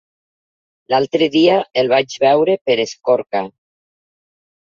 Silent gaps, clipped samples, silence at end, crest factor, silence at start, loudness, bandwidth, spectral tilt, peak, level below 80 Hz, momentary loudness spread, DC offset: 2.61-2.65 s; under 0.1%; 1.25 s; 16 dB; 0.9 s; -16 LUFS; 7.4 kHz; -5 dB/octave; -2 dBFS; -64 dBFS; 7 LU; under 0.1%